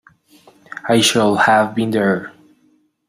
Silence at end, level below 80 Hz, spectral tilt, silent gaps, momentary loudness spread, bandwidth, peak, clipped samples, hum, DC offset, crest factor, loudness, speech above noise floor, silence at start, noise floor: 0.8 s; -58 dBFS; -4 dB/octave; none; 18 LU; 15.5 kHz; -2 dBFS; under 0.1%; none; under 0.1%; 16 dB; -15 LUFS; 44 dB; 0.75 s; -58 dBFS